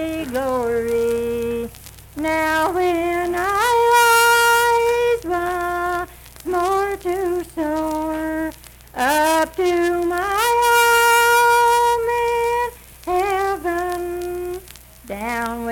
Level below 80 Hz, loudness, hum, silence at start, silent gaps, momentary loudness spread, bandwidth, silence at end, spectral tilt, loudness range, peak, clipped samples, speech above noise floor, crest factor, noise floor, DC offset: -44 dBFS; -18 LUFS; none; 0 s; none; 13 LU; 19 kHz; 0 s; -3 dB/octave; 7 LU; -6 dBFS; under 0.1%; 23 dB; 14 dB; -42 dBFS; under 0.1%